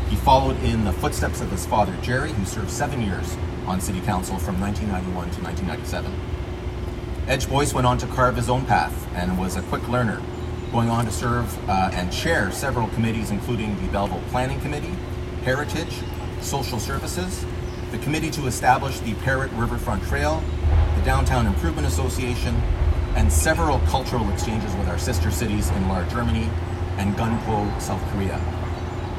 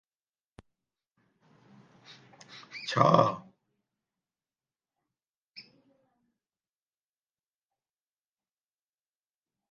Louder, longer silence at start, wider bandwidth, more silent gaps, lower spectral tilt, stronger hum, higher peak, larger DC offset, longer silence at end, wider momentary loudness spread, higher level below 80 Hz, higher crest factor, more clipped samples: about the same, -24 LUFS vs -26 LUFS; second, 0 s vs 2.55 s; first, 15.5 kHz vs 8.8 kHz; second, none vs 5.29-5.52 s; about the same, -5.5 dB/octave vs -6.5 dB/octave; neither; about the same, -4 dBFS vs -6 dBFS; neither; second, 0 s vs 4.1 s; second, 8 LU vs 28 LU; first, -28 dBFS vs -76 dBFS; second, 18 dB vs 30 dB; neither